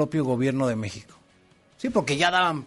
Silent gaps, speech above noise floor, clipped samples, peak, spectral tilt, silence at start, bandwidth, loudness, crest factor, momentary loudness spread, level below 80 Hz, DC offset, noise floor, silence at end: none; 35 dB; under 0.1%; -6 dBFS; -5 dB/octave; 0 s; 11.5 kHz; -24 LUFS; 20 dB; 13 LU; -60 dBFS; under 0.1%; -59 dBFS; 0 s